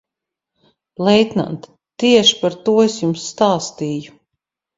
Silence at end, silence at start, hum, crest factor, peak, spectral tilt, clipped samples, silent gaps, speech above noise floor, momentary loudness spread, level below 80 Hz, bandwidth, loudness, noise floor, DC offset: 0.7 s; 1 s; none; 18 dB; 0 dBFS; -4.5 dB/octave; under 0.1%; none; 68 dB; 13 LU; -58 dBFS; 7.8 kHz; -16 LUFS; -83 dBFS; under 0.1%